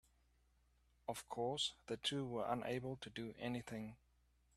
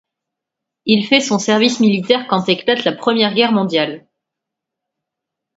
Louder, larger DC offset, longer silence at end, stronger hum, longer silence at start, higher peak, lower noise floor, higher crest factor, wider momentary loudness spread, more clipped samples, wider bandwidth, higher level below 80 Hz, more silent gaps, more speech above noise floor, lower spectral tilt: second, -44 LUFS vs -15 LUFS; neither; second, 0.6 s vs 1.6 s; first, 60 Hz at -70 dBFS vs none; first, 1.1 s vs 0.85 s; second, -24 dBFS vs 0 dBFS; second, -76 dBFS vs -82 dBFS; about the same, 22 dB vs 18 dB; first, 9 LU vs 6 LU; neither; first, 14.5 kHz vs 8 kHz; second, -72 dBFS vs -62 dBFS; neither; second, 32 dB vs 67 dB; about the same, -4.5 dB/octave vs -4.5 dB/octave